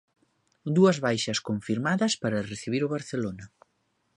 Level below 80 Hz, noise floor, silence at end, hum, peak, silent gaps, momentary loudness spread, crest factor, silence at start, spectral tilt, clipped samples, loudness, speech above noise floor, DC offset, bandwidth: -62 dBFS; -73 dBFS; 0.7 s; none; -10 dBFS; none; 11 LU; 18 dB; 0.65 s; -5 dB/octave; under 0.1%; -27 LUFS; 47 dB; under 0.1%; 11 kHz